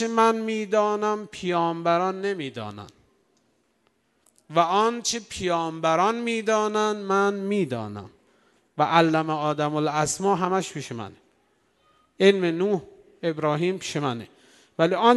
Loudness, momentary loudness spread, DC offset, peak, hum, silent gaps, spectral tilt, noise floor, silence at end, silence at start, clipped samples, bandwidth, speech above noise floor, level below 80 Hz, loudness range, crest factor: -24 LUFS; 14 LU; under 0.1%; -2 dBFS; none; none; -4.5 dB/octave; -68 dBFS; 0 s; 0 s; under 0.1%; 12 kHz; 45 dB; -64 dBFS; 4 LU; 22 dB